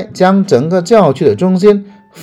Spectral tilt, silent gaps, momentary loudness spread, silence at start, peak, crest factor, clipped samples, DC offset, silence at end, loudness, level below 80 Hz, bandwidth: -7 dB/octave; none; 3 LU; 0 s; 0 dBFS; 10 dB; 1%; under 0.1%; 0 s; -10 LUFS; -50 dBFS; 11.5 kHz